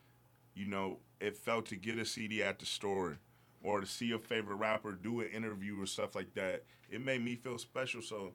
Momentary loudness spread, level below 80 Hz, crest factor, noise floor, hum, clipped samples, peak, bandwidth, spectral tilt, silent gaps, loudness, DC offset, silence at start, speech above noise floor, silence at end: 7 LU; -76 dBFS; 20 dB; -67 dBFS; none; under 0.1%; -20 dBFS; 19 kHz; -4 dB/octave; none; -40 LUFS; under 0.1%; 0.55 s; 28 dB; 0 s